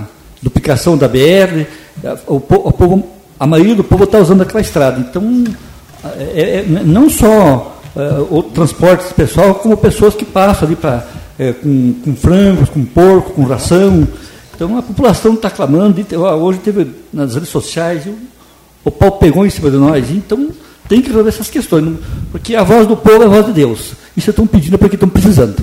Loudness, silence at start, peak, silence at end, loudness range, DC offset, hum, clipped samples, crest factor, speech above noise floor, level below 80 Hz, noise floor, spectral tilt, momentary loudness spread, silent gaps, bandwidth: -10 LUFS; 0 s; 0 dBFS; 0 s; 3 LU; under 0.1%; none; 0.4%; 10 dB; 33 dB; -28 dBFS; -42 dBFS; -7 dB/octave; 13 LU; none; 16.5 kHz